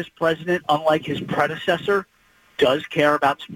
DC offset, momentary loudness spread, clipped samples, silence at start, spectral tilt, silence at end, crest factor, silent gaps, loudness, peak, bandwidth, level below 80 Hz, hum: under 0.1%; 5 LU; under 0.1%; 0 s; -5.5 dB/octave; 0 s; 16 dB; none; -21 LUFS; -6 dBFS; 17 kHz; -58 dBFS; none